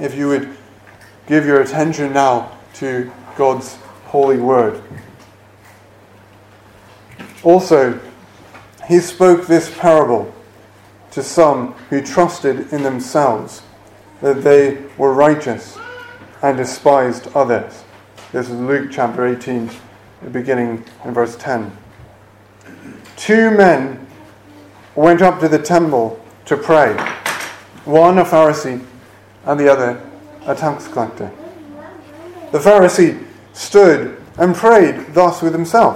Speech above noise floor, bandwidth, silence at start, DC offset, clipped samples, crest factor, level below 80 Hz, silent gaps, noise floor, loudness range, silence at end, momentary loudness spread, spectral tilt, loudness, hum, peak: 31 dB; 15.5 kHz; 0 s; under 0.1%; 0.2%; 16 dB; -54 dBFS; none; -44 dBFS; 7 LU; 0 s; 20 LU; -6 dB/octave; -14 LUFS; none; 0 dBFS